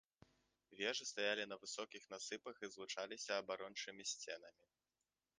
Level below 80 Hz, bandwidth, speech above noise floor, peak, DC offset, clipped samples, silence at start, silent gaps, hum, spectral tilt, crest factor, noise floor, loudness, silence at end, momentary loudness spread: under -90 dBFS; 10 kHz; over 43 dB; -24 dBFS; under 0.1%; under 0.1%; 0.7 s; none; none; -1 dB/octave; 24 dB; under -90 dBFS; -46 LUFS; 0.9 s; 10 LU